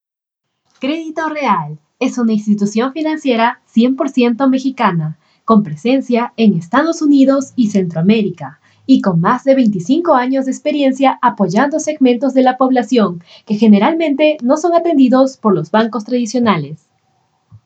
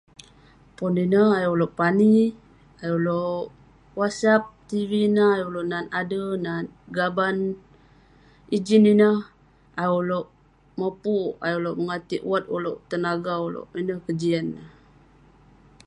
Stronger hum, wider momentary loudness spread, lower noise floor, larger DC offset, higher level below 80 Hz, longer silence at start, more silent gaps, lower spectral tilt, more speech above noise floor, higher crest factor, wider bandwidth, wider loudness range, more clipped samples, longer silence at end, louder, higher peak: neither; second, 9 LU vs 13 LU; first, -79 dBFS vs -54 dBFS; neither; about the same, -64 dBFS vs -60 dBFS; about the same, 0.8 s vs 0.8 s; neither; about the same, -6.5 dB/octave vs -7 dB/octave; first, 66 dB vs 32 dB; about the same, 14 dB vs 18 dB; second, 8.2 kHz vs 10.5 kHz; about the same, 3 LU vs 5 LU; neither; second, 0.9 s vs 1.2 s; first, -14 LUFS vs -23 LUFS; first, 0 dBFS vs -6 dBFS